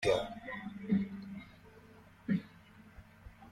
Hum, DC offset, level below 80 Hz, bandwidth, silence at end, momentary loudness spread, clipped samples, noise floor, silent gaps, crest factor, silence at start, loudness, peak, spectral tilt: none; under 0.1%; -62 dBFS; 13 kHz; 0 s; 23 LU; under 0.1%; -58 dBFS; none; 22 dB; 0 s; -38 LUFS; -18 dBFS; -6.5 dB/octave